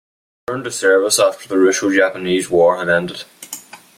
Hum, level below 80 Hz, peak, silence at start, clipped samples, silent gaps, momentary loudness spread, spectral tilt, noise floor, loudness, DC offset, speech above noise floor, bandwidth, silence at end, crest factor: none; -58 dBFS; -2 dBFS; 0.5 s; under 0.1%; none; 18 LU; -3 dB/octave; -36 dBFS; -15 LUFS; under 0.1%; 20 dB; 16 kHz; 0.2 s; 16 dB